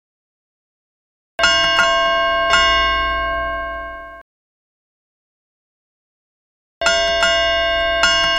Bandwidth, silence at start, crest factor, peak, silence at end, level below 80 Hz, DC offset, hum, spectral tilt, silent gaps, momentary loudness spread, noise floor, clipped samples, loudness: 13 kHz; 1.4 s; 18 dB; 0 dBFS; 0 s; -38 dBFS; under 0.1%; none; -1 dB/octave; 4.21-6.81 s; 13 LU; under -90 dBFS; under 0.1%; -15 LUFS